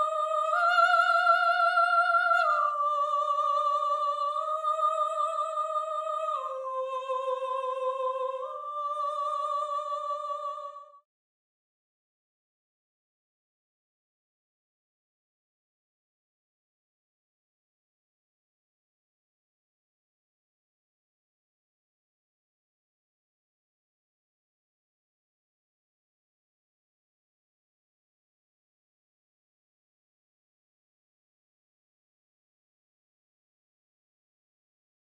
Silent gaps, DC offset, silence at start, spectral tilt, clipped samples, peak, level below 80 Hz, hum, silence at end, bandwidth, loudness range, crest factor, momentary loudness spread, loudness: none; under 0.1%; 0 s; 3.5 dB/octave; under 0.1%; -12 dBFS; under -90 dBFS; none; 24.2 s; 12 kHz; 12 LU; 20 dB; 11 LU; -27 LUFS